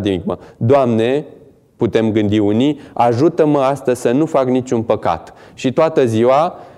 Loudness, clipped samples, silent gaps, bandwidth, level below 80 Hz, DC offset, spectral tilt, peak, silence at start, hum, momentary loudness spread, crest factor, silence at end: -15 LUFS; under 0.1%; none; 12.5 kHz; -52 dBFS; under 0.1%; -7 dB/octave; -2 dBFS; 0 s; none; 8 LU; 14 dB; 0.1 s